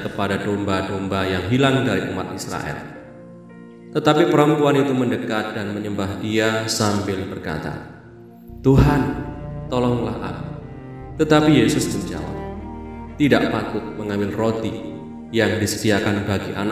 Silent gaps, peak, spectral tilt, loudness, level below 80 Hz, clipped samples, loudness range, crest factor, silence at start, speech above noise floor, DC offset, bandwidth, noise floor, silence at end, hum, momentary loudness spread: none; 0 dBFS; -5.5 dB/octave; -20 LUFS; -38 dBFS; under 0.1%; 4 LU; 20 dB; 0 s; 22 dB; under 0.1%; 16 kHz; -42 dBFS; 0 s; none; 18 LU